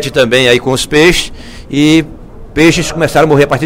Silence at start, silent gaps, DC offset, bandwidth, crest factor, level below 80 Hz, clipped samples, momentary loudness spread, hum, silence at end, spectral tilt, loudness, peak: 0 s; none; under 0.1%; 16.5 kHz; 10 dB; -30 dBFS; 0.8%; 11 LU; none; 0 s; -4.5 dB/octave; -9 LUFS; 0 dBFS